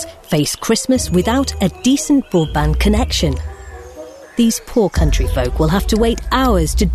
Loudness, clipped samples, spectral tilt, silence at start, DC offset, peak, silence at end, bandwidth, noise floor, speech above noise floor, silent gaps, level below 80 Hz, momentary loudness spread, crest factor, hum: -16 LUFS; under 0.1%; -5 dB/octave; 0 s; under 0.1%; -4 dBFS; 0 s; 13.5 kHz; -35 dBFS; 20 dB; none; -22 dBFS; 11 LU; 12 dB; none